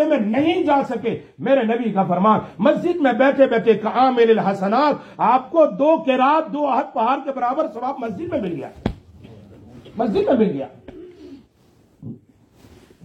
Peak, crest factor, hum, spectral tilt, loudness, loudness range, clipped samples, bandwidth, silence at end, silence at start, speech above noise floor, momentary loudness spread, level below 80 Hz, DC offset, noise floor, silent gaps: -2 dBFS; 16 dB; none; -7.5 dB/octave; -19 LUFS; 8 LU; under 0.1%; 8.4 kHz; 0.9 s; 0 s; 37 dB; 12 LU; -52 dBFS; under 0.1%; -55 dBFS; none